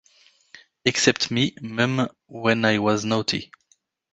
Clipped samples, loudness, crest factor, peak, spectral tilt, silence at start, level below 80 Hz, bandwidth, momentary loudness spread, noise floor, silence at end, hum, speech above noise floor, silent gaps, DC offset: under 0.1%; -22 LUFS; 22 dB; -2 dBFS; -4 dB/octave; 0.55 s; -58 dBFS; 9.6 kHz; 7 LU; -65 dBFS; 0.7 s; none; 43 dB; none; under 0.1%